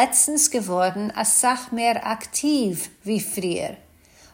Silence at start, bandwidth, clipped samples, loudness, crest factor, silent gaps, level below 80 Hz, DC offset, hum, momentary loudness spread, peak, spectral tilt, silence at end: 0 s; 16.5 kHz; under 0.1%; -21 LUFS; 18 dB; none; -62 dBFS; under 0.1%; none; 10 LU; -4 dBFS; -2.5 dB/octave; 0.6 s